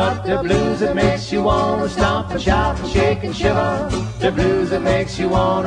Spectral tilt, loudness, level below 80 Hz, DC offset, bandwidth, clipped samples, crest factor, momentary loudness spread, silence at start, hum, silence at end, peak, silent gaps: -6 dB/octave; -18 LUFS; -30 dBFS; under 0.1%; 10.5 kHz; under 0.1%; 14 dB; 3 LU; 0 s; none; 0 s; -2 dBFS; none